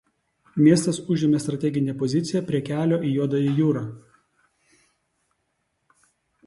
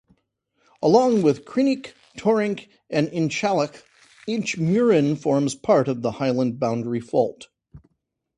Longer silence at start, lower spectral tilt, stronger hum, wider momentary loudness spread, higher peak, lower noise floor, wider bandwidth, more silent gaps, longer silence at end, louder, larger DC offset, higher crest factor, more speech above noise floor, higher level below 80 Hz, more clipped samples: second, 0.55 s vs 0.8 s; about the same, -7 dB/octave vs -6.5 dB/octave; neither; about the same, 8 LU vs 9 LU; about the same, -4 dBFS vs -4 dBFS; about the same, -74 dBFS vs -75 dBFS; about the same, 11.5 kHz vs 11 kHz; neither; first, 2.5 s vs 0.6 s; about the same, -23 LUFS vs -22 LUFS; neither; about the same, 20 dB vs 18 dB; about the same, 52 dB vs 54 dB; about the same, -64 dBFS vs -62 dBFS; neither